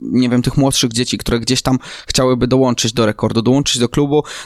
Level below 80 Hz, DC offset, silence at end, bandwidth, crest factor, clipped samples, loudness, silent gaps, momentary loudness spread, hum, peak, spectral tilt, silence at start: -36 dBFS; under 0.1%; 0 s; 15 kHz; 12 dB; under 0.1%; -15 LUFS; none; 4 LU; none; -2 dBFS; -4.5 dB/octave; 0 s